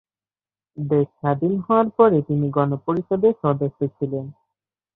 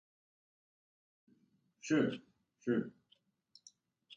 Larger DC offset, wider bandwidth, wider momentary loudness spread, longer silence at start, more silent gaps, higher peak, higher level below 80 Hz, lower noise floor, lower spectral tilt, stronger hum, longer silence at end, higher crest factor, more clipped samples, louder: neither; second, 4 kHz vs 7.8 kHz; second, 11 LU vs 16 LU; second, 0.75 s vs 1.85 s; neither; first, -2 dBFS vs -20 dBFS; first, -60 dBFS vs -82 dBFS; first, under -90 dBFS vs -75 dBFS; first, -12 dB/octave vs -6 dB/octave; neither; first, 0.65 s vs 0 s; about the same, 18 dB vs 22 dB; neither; first, -21 LUFS vs -36 LUFS